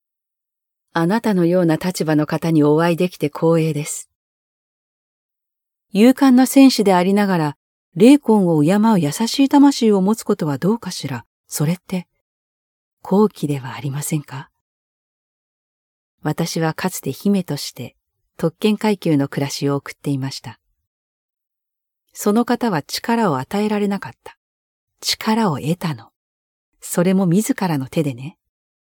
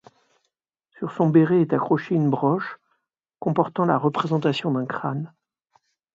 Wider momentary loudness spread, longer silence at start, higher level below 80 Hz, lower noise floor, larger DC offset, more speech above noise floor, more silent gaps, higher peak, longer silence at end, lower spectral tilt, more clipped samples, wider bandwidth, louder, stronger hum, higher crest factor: about the same, 14 LU vs 14 LU; about the same, 0.95 s vs 1 s; first, -62 dBFS vs -68 dBFS; first, -83 dBFS vs -78 dBFS; neither; first, 66 dB vs 56 dB; first, 4.15-5.29 s, 7.56-7.92 s, 11.26-11.44 s, 12.21-12.97 s, 14.61-16.18 s, 20.87-21.29 s, 24.37-24.88 s, 26.16-26.72 s vs none; first, 0 dBFS vs -4 dBFS; second, 0.6 s vs 0.85 s; second, -6 dB/octave vs -8.5 dB/octave; neither; first, 18.5 kHz vs 7.6 kHz; first, -18 LUFS vs -22 LUFS; neither; about the same, 18 dB vs 18 dB